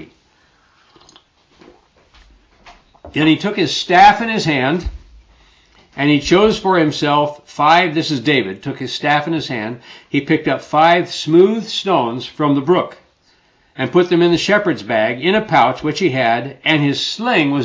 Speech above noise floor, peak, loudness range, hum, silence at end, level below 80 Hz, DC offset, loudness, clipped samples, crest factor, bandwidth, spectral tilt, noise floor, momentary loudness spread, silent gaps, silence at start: 41 dB; 0 dBFS; 2 LU; none; 0 s; -44 dBFS; under 0.1%; -15 LUFS; under 0.1%; 16 dB; 8 kHz; -5.5 dB/octave; -56 dBFS; 10 LU; none; 0 s